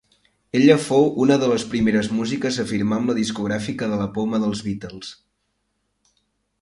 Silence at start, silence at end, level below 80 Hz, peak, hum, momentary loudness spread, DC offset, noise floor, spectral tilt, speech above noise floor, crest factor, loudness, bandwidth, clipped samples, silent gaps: 0.55 s; 1.5 s; -54 dBFS; 0 dBFS; none; 12 LU; under 0.1%; -72 dBFS; -5.5 dB/octave; 52 dB; 20 dB; -20 LUFS; 11.5 kHz; under 0.1%; none